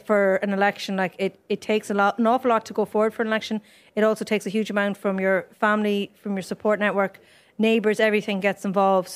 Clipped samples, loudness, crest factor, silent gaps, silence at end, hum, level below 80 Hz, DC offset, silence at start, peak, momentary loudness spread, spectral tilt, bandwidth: under 0.1%; -23 LUFS; 16 dB; none; 0 s; none; -72 dBFS; under 0.1%; 0.1 s; -6 dBFS; 8 LU; -5.5 dB/octave; 15 kHz